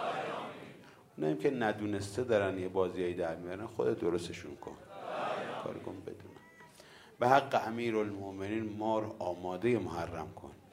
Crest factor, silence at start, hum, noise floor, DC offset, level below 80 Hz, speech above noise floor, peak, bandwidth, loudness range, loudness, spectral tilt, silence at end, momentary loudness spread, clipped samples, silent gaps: 24 dB; 0 s; none; -57 dBFS; under 0.1%; -70 dBFS; 23 dB; -12 dBFS; 16 kHz; 5 LU; -35 LUFS; -6 dB/octave; 0.15 s; 19 LU; under 0.1%; none